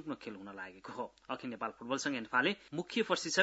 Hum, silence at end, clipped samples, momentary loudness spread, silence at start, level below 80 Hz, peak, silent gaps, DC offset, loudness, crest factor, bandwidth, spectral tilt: none; 0 s; under 0.1%; 14 LU; 0 s; -76 dBFS; -14 dBFS; none; under 0.1%; -37 LUFS; 24 dB; 8 kHz; -2 dB/octave